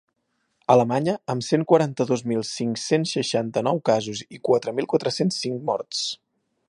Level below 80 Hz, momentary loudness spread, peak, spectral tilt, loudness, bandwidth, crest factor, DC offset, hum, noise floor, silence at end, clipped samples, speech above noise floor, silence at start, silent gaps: -68 dBFS; 8 LU; -2 dBFS; -5 dB/octave; -23 LUFS; 11.5 kHz; 20 dB; under 0.1%; none; -73 dBFS; 0.55 s; under 0.1%; 50 dB; 0.7 s; none